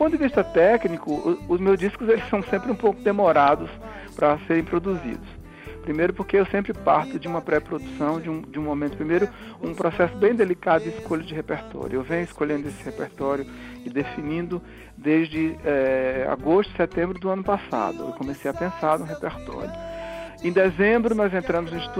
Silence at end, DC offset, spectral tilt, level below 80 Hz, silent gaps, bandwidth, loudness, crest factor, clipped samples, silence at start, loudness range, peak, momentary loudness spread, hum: 0 s; under 0.1%; -7 dB/octave; -46 dBFS; none; 15 kHz; -24 LUFS; 18 dB; under 0.1%; 0 s; 6 LU; -6 dBFS; 14 LU; none